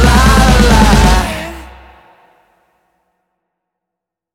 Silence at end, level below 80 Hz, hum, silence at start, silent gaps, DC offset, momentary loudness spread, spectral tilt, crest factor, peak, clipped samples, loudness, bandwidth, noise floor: 2.7 s; -16 dBFS; none; 0 s; none; under 0.1%; 17 LU; -5 dB/octave; 12 dB; 0 dBFS; under 0.1%; -9 LUFS; 16 kHz; -81 dBFS